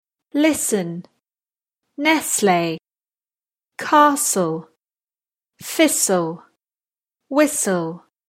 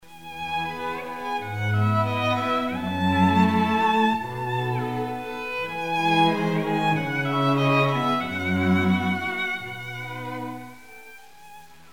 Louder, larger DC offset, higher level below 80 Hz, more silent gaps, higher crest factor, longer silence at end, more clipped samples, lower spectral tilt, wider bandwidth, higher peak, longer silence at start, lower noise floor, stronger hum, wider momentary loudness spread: first, -18 LUFS vs -24 LUFS; second, under 0.1% vs 0.4%; second, -66 dBFS vs -56 dBFS; first, 5.04-5.08 s vs none; about the same, 20 dB vs 18 dB; about the same, 0.3 s vs 0.3 s; neither; second, -3.5 dB/octave vs -6.5 dB/octave; about the same, 16.5 kHz vs 16.5 kHz; first, -2 dBFS vs -8 dBFS; first, 0.35 s vs 0.1 s; first, under -90 dBFS vs -48 dBFS; neither; first, 16 LU vs 13 LU